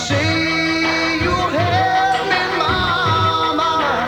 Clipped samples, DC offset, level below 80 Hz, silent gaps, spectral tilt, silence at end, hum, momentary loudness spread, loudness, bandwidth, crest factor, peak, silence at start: under 0.1%; under 0.1%; -38 dBFS; none; -4.5 dB/octave; 0 s; none; 2 LU; -16 LUFS; 19.5 kHz; 12 dB; -4 dBFS; 0 s